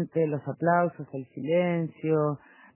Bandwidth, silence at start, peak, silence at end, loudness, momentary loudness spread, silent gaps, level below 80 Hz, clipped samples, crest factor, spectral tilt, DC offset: 3.2 kHz; 0 s; -10 dBFS; 0.4 s; -27 LUFS; 13 LU; none; -72 dBFS; under 0.1%; 18 dB; -11.5 dB/octave; under 0.1%